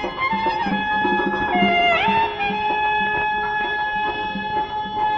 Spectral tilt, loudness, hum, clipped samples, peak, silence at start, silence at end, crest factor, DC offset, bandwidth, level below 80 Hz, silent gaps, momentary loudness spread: -6 dB/octave; -20 LUFS; none; under 0.1%; -6 dBFS; 0 s; 0 s; 16 dB; under 0.1%; 7.2 kHz; -46 dBFS; none; 8 LU